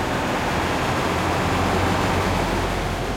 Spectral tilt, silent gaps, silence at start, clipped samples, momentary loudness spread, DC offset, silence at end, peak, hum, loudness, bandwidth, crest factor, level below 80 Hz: -5 dB/octave; none; 0 s; under 0.1%; 2 LU; under 0.1%; 0 s; -8 dBFS; none; -22 LUFS; 16.5 kHz; 12 dB; -34 dBFS